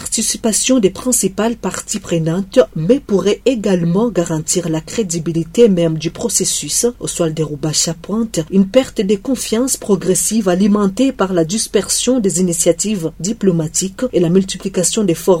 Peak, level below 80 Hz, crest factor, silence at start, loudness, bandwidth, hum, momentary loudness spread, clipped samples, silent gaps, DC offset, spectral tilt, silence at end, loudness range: 0 dBFS; -42 dBFS; 16 dB; 0 s; -15 LUFS; 16.5 kHz; none; 6 LU; under 0.1%; none; under 0.1%; -4.5 dB/octave; 0 s; 1 LU